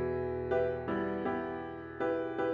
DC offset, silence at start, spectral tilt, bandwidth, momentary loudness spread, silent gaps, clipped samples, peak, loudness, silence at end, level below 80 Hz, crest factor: under 0.1%; 0 s; -9 dB/octave; 6.8 kHz; 7 LU; none; under 0.1%; -20 dBFS; -35 LUFS; 0 s; -60 dBFS; 14 dB